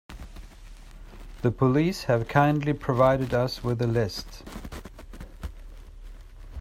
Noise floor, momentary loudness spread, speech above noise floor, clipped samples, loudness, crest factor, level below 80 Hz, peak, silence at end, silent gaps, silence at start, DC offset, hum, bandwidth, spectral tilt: -45 dBFS; 23 LU; 21 dB; under 0.1%; -25 LUFS; 20 dB; -44 dBFS; -8 dBFS; 0 s; none; 0.1 s; under 0.1%; none; 15.5 kHz; -7 dB/octave